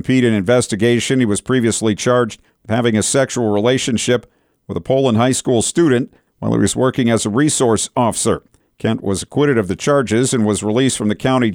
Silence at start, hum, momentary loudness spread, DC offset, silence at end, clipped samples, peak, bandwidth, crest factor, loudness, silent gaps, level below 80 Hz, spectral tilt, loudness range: 0.05 s; none; 6 LU; under 0.1%; 0 s; under 0.1%; -4 dBFS; 16.5 kHz; 12 dB; -16 LUFS; none; -48 dBFS; -5 dB/octave; 1 LU